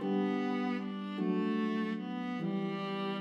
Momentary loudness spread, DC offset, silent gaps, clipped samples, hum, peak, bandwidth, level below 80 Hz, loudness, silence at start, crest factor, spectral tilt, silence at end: 5 LU; under 0.1%; none; under 0.1%; none; -20 dBFS; 7 kHz; under -90 dBFS; -35 LUFS; 0 s; 14 dB; -8 dB/octave; 0 s